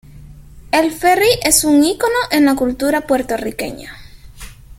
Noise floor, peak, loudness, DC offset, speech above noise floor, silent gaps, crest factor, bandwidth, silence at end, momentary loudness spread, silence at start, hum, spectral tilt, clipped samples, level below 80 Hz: -37 dBFS; 0 dBFS; -14 LUFS; under 0.1%; 23 dB; none; 16 dB; 17 kHz; 0.05 s; 14 LU; 0.15 s; none; -2.5 dB/octave; under 0.1%; -40 dBFS